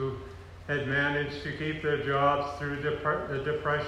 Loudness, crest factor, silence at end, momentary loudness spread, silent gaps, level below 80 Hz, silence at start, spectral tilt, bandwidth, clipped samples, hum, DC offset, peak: -30 LUFS; 18 dB; 0 s; 9 LU; none; -52 dBFS; 0 s; -6.5 dB/octave; 11 kHz; under 0.1%; none; under 0.1%; -12 dBFS